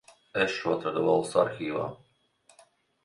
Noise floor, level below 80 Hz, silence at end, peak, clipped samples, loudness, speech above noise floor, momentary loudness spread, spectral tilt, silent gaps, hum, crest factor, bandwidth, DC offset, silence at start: -64 dBFS; -68 dBFS; 1.1 s; -10 dBFS; under 0.1%; -28 LUFS; 37 dB; 10 LU; -5 dB/octave; none; none; 20 dB; 11.5 kHz; under 0.1%; 0.35 s